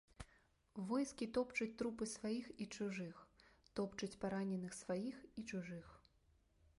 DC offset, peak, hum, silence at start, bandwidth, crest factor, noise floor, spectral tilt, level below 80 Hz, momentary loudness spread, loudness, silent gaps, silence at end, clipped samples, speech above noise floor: under 0.1%; -28 dBFS; none; 0.2 s; 11.5 kHz; 18 dB; -76 dBFS; -5 dB/octave; -72 dBFS; 14 LU; -45 LUFS; none; 0.8 s; under 0.1%; 31 dB